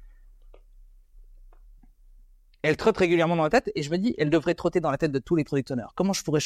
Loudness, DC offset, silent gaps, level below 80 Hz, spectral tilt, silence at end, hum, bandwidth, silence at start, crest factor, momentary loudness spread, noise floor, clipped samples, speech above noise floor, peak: -25 LUFS; under 0.1%; none; -52 dBFS; -5.5 dB/octave; 0 s; none; 14 kHz; 0 s; 18 dB; 6 LU; -54 dBFS; under 0.1%; 30 dB; -8 dBFS